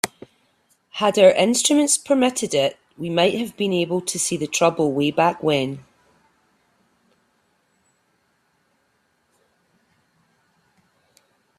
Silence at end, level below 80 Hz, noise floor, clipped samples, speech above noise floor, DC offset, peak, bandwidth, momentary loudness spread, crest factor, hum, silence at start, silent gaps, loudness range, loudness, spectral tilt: 5.8 s; -64 dBFS; -67 dBFS; under 0.1%; 48 dB; under 0.1%; 0 dBFS; 15.5 kHz; 10 LU; 22 dB; none; 0.05 s; none; 8 LU; -19 LUFS; -3.5 dB/octave